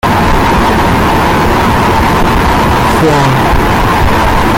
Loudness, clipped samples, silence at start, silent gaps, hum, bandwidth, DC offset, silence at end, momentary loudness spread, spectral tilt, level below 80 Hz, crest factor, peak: -9 LUFS; under 0.1%; 0.05 s; none; none; 17 kHz; under 0.1%; 0 s; 1 LU; -5.5 dB/octave; -16 dBFS; 8 dB; 0 dBFS